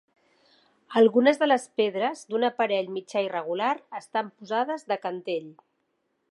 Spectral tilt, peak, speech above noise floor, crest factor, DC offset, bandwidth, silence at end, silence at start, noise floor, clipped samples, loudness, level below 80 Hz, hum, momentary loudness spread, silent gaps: -4.5 dB/octave; -8 dBFS; 49 dB; 20 dB; under 0.1%; 11.5 kHz; 0.8 s; 0.9 s; -75 dBFS; under 0.1%; -26 LUFS; -84 dBFS; none; 11 LU; none